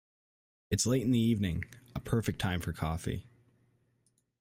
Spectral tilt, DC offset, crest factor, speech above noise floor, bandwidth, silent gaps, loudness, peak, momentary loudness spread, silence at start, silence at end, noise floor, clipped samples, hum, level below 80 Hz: -5.5 dB/octave; under 0.1%; 18 dB; 44 dB; 16 kHz; none; -32 LUFS; -16 dBFS; 12 LU; 0.7 s; 1.2 s; -75 dBFS; under 0.1%; none; -52 dBFS